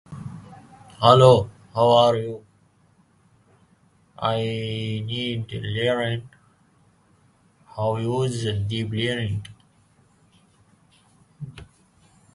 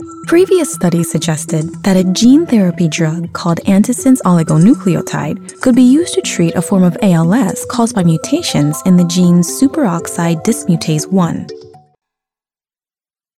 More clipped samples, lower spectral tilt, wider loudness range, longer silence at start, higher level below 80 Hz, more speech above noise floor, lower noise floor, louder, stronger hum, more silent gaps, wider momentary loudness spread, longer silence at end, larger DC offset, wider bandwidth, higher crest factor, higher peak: neither; about the same, -6.5 dB/octave vs -6 dB/octave; first, 10 LU vs 4 LU; about the same, 0.1 s vs 0 s; about the same, -52 dBFS vs -52 dBFS; second, 39 dB vs over 79 dB; second, -60 dBFS vs under -90 dBFS; second, -22 LUFS vs -12 LUFS; neither; neither; first, 24 LU vs 7 LU; second, 0.7 s vs 1.75 s; neither; second, 11.5 kHz vs 15 kHz; first, 24 dB vs 12 dB; about the same, 0 dBFS vs 0 dBFS